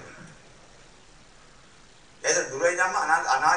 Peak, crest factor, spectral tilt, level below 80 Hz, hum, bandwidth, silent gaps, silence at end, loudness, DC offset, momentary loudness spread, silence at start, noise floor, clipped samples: -8 dBFS; 20 dB; -1 dB/octave; -62 dBFS; none; 10 kHz; none; 0 s; -24 LUFS; 0.1%; 17 LU; 0 s; -54 dBFS; under 0.1%